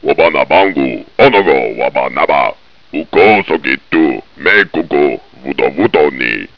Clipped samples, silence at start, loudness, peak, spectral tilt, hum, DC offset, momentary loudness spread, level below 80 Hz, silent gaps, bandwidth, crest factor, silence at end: 0.4%; 0 s; -11 LUFS; 0 dBFS; -7 dB/octave; none; 1%; 9 LU; -46 dBFS; none; 5.4 kHz; 12 dB; 0.1 s